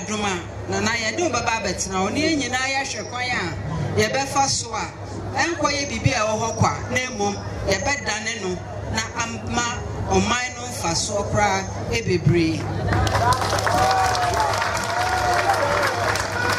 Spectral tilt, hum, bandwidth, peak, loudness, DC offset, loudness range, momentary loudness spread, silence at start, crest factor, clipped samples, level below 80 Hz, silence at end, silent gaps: -4 dB/octave; none; 16 kHz; -4 dBFS; -22 LUFS; under 0.1%; 4 LU; 7 LU; 0 s; 18 dB; under 0.1%; -40 dBFS; 0 s; none